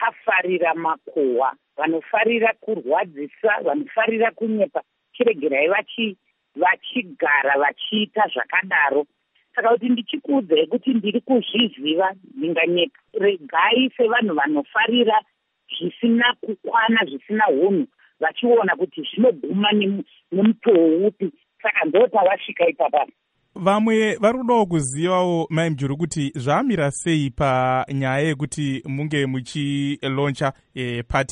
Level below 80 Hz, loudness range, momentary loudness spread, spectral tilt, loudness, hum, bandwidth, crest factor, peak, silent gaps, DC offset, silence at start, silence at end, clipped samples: -52 dBFS; 3 LU; 8 LU; -5.5 dB/octave; -20 LUFS; none; 11 kHz; 16 dB; -4 dBFS; none; under 0.1%; 0 s; 0 s; under 0.1%